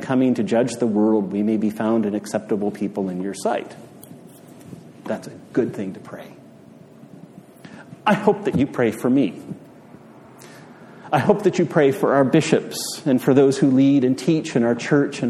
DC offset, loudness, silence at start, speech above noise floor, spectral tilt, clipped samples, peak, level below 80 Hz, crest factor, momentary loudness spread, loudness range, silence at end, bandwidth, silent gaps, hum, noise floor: under 0.1%; -20 LUFS; 0 s; 26 dB; -6.5 dB/octave; under 0.1%; -2 dBFS; -62 dBFS; 20 dB; 20 LU; 13 LU; 0 s; 14.5 kHz; none; none; -45 dBFS